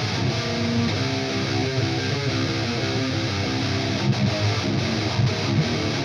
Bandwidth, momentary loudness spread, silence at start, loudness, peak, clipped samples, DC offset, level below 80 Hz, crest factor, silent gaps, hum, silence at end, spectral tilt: 10.5 kHz; 2 LU; 0 s; -23 LUFS; -10 dBFS; under 0.1%; under 0.1%; -46 dBFS; 14 dB; none; none; 0 s; -5.5 dB/octave